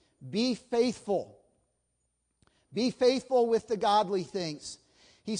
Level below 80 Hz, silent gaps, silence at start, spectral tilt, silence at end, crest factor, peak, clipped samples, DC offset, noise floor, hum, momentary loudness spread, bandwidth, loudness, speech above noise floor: -70 dBFS; none; 0.2 s; -5 dB/octave; 0 s; 18 dB; -14 dBFS; under 0.1%; under 0.1%; -78 dBFS; none; 16 LU; 10.5 kHz; -29 LUFS; 50 dB